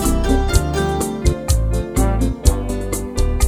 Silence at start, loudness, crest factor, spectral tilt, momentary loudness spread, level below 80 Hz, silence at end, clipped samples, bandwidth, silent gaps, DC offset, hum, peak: 0 s; -19 LUFS; 16 dB; -5.5 dB/octave; 6 LU; -20 dBFS; 0 s; under 0.1%; 16 kHz; none; under 0.1%; none; 0 dBFS